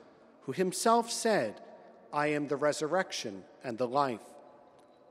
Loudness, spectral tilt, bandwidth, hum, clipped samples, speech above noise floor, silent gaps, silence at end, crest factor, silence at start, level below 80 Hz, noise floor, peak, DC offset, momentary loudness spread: -31 LUFS; -4 dB/octave; 15.5 kHz; none; under 0.1%; 28 dB; none; 0.65 s; 20 dB; 0.45 s; -80 dBFS; -59 dBFS; -12 dBFS; under 0.1%; 15 LU